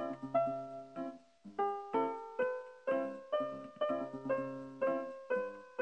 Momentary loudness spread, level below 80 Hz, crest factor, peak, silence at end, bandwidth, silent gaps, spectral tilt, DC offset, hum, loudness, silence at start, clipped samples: 9 LU; -82 dBFS; 16 dB; -22 dBFS; 0 s; 8.6 kHz; none; -7 dB/octave; under 0.1%; none; -38 LUFS; 0 s; under 0.1%